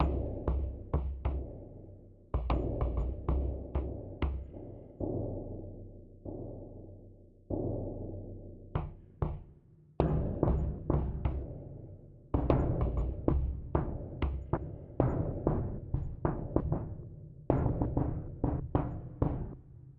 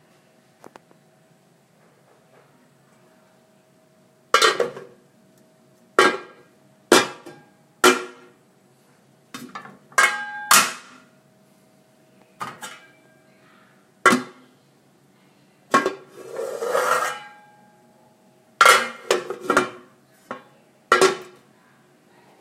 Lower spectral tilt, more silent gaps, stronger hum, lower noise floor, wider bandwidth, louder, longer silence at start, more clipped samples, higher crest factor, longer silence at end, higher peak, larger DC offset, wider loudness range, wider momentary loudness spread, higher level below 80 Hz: first, -11.5 dB/octave vs -1.5 dB/octave; neither; neither; about the same, -59 dBFS vs -58 dBFS; second, 4.3 kHz vs 16 kHz; second, -36 LUFS vs -19 LUFS; second, 0 s vs 4.35 s; neither; about the same, 24 dB vs 26 dB; second, 0.05 s vs 1.15 s; second, -10 dBFS vs 0 dBFS; neither; about the same, 8 LU vs 6 LU; second, 17 LU vs 24 LU; first, -38 dBFS vs -70 dBFS